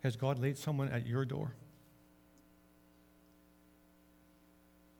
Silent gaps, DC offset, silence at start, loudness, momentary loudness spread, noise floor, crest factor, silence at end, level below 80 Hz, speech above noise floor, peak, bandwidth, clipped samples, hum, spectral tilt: none; under 0.1%; 0.05 s; -37 LUFS; 15 LU; -66 dBFS; 22 dB; 3.3 s; -70 dBFS; 30 dB; -20 dBFS; 19.5 kHz; under 0.1%; 60 Hz at -65 dBFS; -7 dB/octave